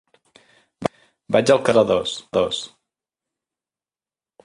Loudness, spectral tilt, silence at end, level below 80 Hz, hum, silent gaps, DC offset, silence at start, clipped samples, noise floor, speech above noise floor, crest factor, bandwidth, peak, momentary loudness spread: -20 LUFS; -4.5 dB/octave; 1.8 s; -56 dBFS; none; none; under 0.1%; 0.8 s; under 0.1%; under -90 dBFS; over 72 dB; 20 dB; 11.5 kHz; -2 dBFS; 13 LU